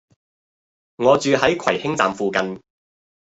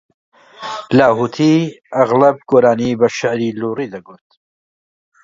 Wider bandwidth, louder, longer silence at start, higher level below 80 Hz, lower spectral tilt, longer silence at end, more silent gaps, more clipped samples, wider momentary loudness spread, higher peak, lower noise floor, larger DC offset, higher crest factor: about the same, 8.2 kHz vs 7.6 kHz; second, -19 LUFS vs -14 LUFS; first, 1 s vs 0.6 s; about the same, -58 dBFS vs -56 dBFS; second, -4.5 dB/octave vs -6.5 dB/octave; second, 0.6 s vs 1.1 s; neither; neither; second, 9 LU vs 15 LU; about the same, 0 dBFS vs 0 dBFS; about the same, under -90 dBFS vs under -90 dBFS; neither; first, 22 dB vs 16 dB